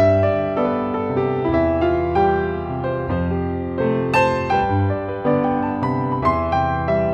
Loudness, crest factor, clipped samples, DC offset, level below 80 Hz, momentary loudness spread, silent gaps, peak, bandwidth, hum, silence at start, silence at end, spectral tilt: -20 LUFS; 14 dB; under 0.1%; under 0.1%; -38 dBFS; 5 LU; none; -4 dBFS; 9 kHz; none; 0 s; 0 s; -8.5 dB/octave